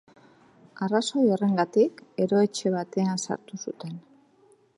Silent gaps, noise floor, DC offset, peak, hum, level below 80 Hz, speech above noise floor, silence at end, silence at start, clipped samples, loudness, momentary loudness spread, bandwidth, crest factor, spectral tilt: none; -60 dBFS; under 0.1%; -8 dBFS; none; -76 dBFS; 35 dB; 0.8 s; 0.8 s; under 0.1%; -26 LUFS; 14 LU; 11.5 kHz; 18 dB; -5.5 dB/octave